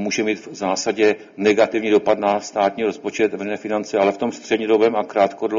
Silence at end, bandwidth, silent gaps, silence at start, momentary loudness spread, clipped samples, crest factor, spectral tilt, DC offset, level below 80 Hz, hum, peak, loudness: 0 s; 7.6 kHz; none; 0 s; 7 LU; under 0.1%; 16 dB; -4 dB/octave; under 0.1%; -64 dBFS; none; -2 dBFS; -20 LUFS